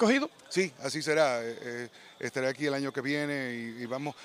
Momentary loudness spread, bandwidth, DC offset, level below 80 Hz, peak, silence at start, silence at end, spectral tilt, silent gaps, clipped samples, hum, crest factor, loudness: 12 LU; 15.5 kHz; under 0.1%; -80 dBFS; -12 dBFS; 0 s; 0 s; -4.5 dB/octave; none; under 0.1%; none; 20 dB; -31 LUFS